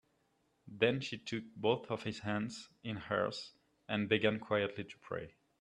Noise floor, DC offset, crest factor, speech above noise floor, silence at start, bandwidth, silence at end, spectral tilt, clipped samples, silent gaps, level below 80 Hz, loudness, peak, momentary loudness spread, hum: -77 dBFS; under 0.1%; 24 dB; 40 dB; 0.65 s; 10.5 kHz; 0.3 s; -5.5 dB/octave; under 0.1%; none; -72 dBFS; -37 LUFS; -14 dBFS; 14 LU; none